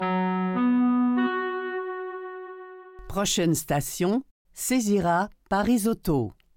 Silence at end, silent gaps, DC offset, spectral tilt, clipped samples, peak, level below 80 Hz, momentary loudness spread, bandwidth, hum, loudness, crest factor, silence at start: 0.25 s; 4.31-4.45 s; under 0.1%; -5 dB/octave; under 0.1%; -14 dBFS; -48 dBFS; 16 LU; 17 kHz; none; -25 LUFS; 12 dB; 0 s